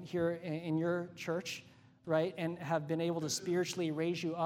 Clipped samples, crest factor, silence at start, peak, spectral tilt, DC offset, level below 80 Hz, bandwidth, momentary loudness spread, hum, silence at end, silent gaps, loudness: under 0.1%; 18 dB; 0 s; -18 dBFS; -5 dB/octave; under 0.1%; -74 dBFS; 16 kHz; 5 LU; none; 0 s; none; -36 LUFS